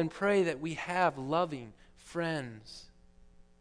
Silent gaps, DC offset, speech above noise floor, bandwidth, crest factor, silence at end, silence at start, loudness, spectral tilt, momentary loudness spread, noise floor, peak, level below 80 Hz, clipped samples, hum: none; under 0.1%; 26 dB; 11 kHz; 20 dB; 0.75 s; 0 s; -32 LUFS; -6 dB/octave; 20 LU; -59 dBFS; -14 dBFS; -62 dBFS; under 0.1%; none